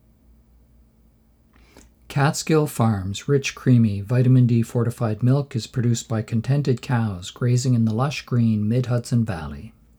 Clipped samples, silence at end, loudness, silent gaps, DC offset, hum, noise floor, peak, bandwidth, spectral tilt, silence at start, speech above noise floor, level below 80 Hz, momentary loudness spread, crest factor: under 0.1%; 0.3 s; -21 LUFS; none; under 0.1%; none; -57 dBFS; -6 dBFS; 14.5 kHz; -7 dB/octave; 2.1 s; 37 dB; -50 dBFS; 8 LU; 16 dB